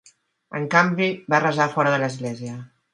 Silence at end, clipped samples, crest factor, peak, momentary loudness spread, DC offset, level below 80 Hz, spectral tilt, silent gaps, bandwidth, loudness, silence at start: 0.3 s; under 0.1%; 22 dB; 0 dBFS; 15 LU; under 0.1%; -68 dBFS; -5.5 dB/octave; none; 11.5 kHz; -21 LUFS; 0.5 s